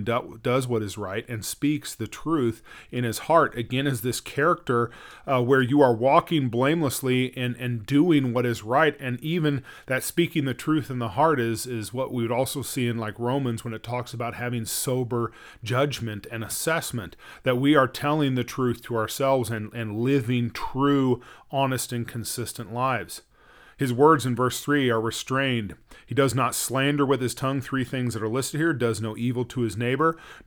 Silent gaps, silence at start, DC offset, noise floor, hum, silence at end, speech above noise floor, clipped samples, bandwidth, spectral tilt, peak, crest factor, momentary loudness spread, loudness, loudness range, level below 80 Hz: none; 0 s; under 0.1%; -53 dBFS; none; 0.05 s; 29 dB; under 0.1%; over 20 kHz; -5.5 dB/octave; -4 dBFS; 20 dB; 11 LU; -25 LUFS; 5 LU; -56 dBFS